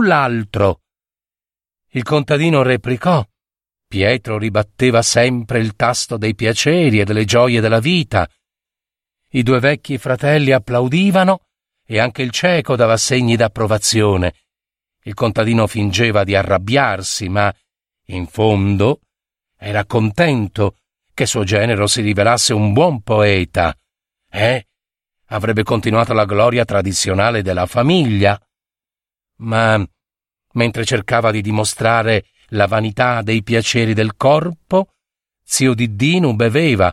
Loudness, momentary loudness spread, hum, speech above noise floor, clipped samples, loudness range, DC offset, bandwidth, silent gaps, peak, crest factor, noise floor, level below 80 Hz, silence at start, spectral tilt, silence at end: -15 LUFS; 7 LU; none; over 75 dB; under 0.1%; 3 LU; under 0.1%; 14.5 kHz; none; 0 dBFS; 16 dB; under -90 dBFS; -44 dBFS; 0 s; -5 dB/octave; 0 s